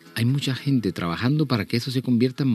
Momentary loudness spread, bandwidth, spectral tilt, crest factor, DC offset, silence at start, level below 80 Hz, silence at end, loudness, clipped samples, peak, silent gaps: 3 LU; 13.5 kHz; -6.5 dB/octave; 14 dB; under 0.1%; 0.05 s; -58 dBFS; 0 s; -23 LUFS; under 0.1%; -8 dBFS; none